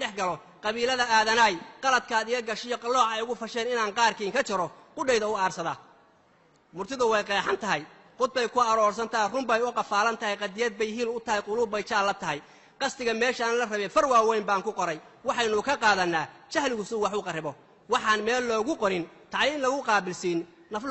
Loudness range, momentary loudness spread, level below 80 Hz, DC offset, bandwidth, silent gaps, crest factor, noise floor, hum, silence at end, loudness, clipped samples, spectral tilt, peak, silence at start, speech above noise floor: 3 LU; 9 LU; -64 dBFS; under 0.1%; 8.2 kHz; none; 18 dB; -62 dBFS; none; 0 s; -27 LUFS; under 0.1%; -3 dB/octave; -10 dBFS; 0 s; 35 dB